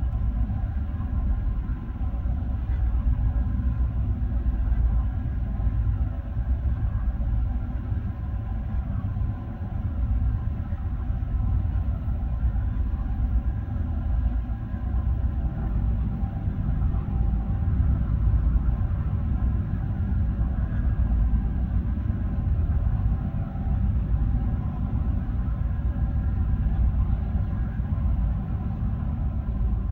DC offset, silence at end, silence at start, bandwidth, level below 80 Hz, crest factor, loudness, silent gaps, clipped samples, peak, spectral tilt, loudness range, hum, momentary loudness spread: under 0.1%; 0 s; 0 s; 3.1 kHz; -26 dBFS; 14 dB; -28 LUFS; none; under 0.1%; -12 dBFS; -11.5 dB/octave; 3 LU; none; 5 LU